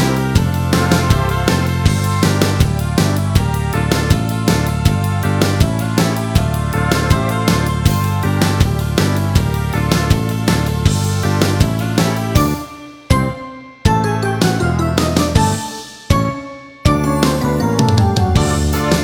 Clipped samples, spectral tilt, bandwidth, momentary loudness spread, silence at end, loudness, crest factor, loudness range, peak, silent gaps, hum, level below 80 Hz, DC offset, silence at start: under 0.1%; -5.5 dB/octave; over 20 kHz; 4 LU; 0 s; -16 LUFS; 14 dB; 2 LU; 0 dBFS; none; none; -26 dBFS; under 0.1%; 0 s